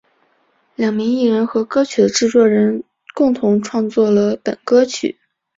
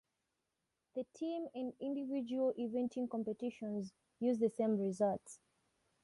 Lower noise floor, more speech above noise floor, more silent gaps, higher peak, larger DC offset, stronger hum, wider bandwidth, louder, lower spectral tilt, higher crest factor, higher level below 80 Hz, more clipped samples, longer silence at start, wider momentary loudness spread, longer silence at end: second, -60 dBFS vs -87 dBFS; second, 45 dB vs 49 dB; neither; first, -2 dBFS vs -24 dBFS; neither; neither; second, 7.8 kHz vs 11.5 kHz; first, -16 LUFS vs -39 LUFS; second, -5 dB/octave vs -7 dB/octave; about the same, 14 dB vs 16 dB; first, -60 dBFS vs -82 dBFS; neither; second, 0.8 s vs 0.95 s; about the same, 10 LU vs 11 LU; second, 0.45 s vs 0.7 s